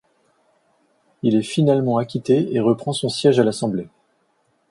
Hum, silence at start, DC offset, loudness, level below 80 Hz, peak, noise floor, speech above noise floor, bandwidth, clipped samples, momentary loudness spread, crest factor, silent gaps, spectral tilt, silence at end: none; 1.25 s; under 0.1%; -19 LUFS; -62 dBFS; -2 dBFS; -65 dBFS; 47 dB; 11.5 kHz; under 0.1%; 8 LU; 18 dB; none; -6.5 dB/octave; 0.85 s